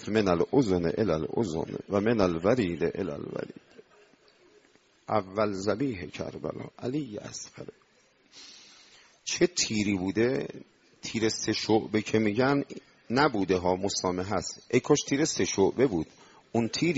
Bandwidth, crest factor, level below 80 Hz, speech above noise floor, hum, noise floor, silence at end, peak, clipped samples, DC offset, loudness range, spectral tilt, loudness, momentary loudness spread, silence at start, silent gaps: 8 kHz; 20 dB; -60 dBFS; 36 dB; none; -64 dBFS; 0 s; -8 dBFS; under 0.1%; under 0.1%; 7 LU; -4.5 dB/octave; -28 LUFS; 15 LU; 0 s; none